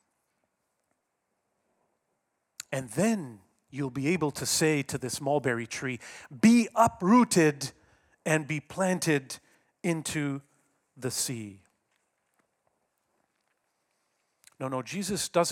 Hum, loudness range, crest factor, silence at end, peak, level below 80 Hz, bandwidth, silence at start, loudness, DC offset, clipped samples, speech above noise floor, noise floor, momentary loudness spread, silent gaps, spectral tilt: none; 13 LU; 22 dB; 0 s; -8 dBFS; -68 dBFS; 17 kHz; 2.7 s; -28 LUFS; under 0.1%; under 0.1%; 52 dB; -80 dBFS; 18 LU; none; -4.5 dB/octave